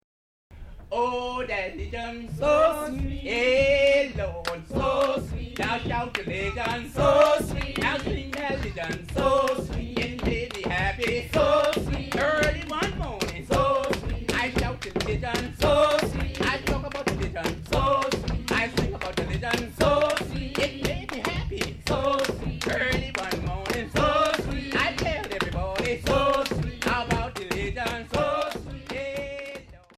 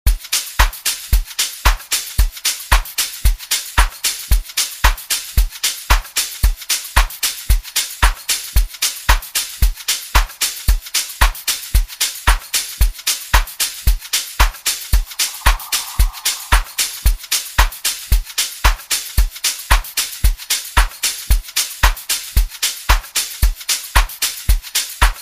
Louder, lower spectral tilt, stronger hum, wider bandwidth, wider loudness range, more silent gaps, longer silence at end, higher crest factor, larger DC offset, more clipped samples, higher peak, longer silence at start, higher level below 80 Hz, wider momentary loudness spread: second, -26 LUFS vs -18 LUFS; first, -5 dB/octave vs -1 dB/octave; neither; about the same, 15.5 kHz vs 15.5 kHz; first, 3 LU vs 0 LU; neither; first, 0.2 s vs 0 s; about the same, 18 dB vs 16 dB; second, under 0.1% vs 0.3%; neither; second, -8 dBFS vs 0 dBFS; first, 0.5 s vs 0.05 s; second, -38 dBFS vs -18 dBFS; first, 9 LU vs 4 LU